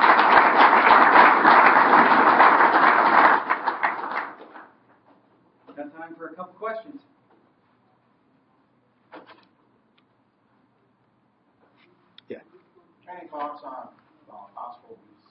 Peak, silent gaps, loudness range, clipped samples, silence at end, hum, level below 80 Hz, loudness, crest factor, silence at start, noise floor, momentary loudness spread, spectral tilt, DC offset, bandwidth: -2 dBFS; none; 26 LU; under 0.1%; 0.6 s; none; -66 dBFS; -16 LUFS; 20 dB; 0 s; -65 dBFS; 26 LU; -8 dB/octave; under 0.1%; 5.8 kHz